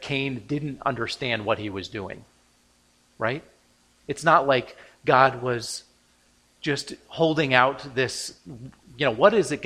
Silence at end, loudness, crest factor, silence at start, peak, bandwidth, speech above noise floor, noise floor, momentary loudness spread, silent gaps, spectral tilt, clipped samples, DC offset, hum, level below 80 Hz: 0 s; -24 LUFS; 24 dB; 0 s; -2 dBFS; 15 kHz; 38 dB; -62 dBFS; 17 LU; none; -4.5 dB/octave; under 0.1%; under 0.1%; none; -60 dBFS